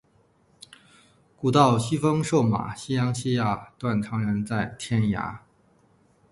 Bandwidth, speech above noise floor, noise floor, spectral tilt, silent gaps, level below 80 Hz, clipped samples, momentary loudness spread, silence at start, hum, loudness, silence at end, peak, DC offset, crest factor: 11.5 kHz; 39 dB; -63 dBFS; -6.5 dB/octave; none; -54 dBFS; under 0.1%; 9 LU; 1.4 s; none; -25 LUFS; 0.95 s; -4 dBFS; under 0.1%; 22 dB